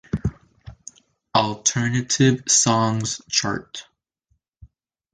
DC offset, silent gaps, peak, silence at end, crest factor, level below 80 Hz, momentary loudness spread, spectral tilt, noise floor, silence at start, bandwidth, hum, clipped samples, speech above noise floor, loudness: under 0.1%; none; -4 dBFS; 0.5 s; 20 dB; -46 dBFS; 20 LU; -3.5 dB/octave; -70 dBFS; 0.15 s; 10 kHz; none; under 0.1%; 49 dB; -20 LUFS